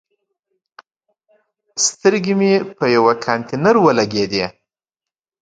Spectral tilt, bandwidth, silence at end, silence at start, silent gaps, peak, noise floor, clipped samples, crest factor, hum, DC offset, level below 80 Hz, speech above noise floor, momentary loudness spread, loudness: -4 dB/octave; 9.6 kHz; 0.9 s; 1.75 s; none; 0 dBFS; -88 dBFS; under 0.1%; 18 dB; none; under 0.1%; -58 dBFS; 73 dB; 8 LU; -16 LUFS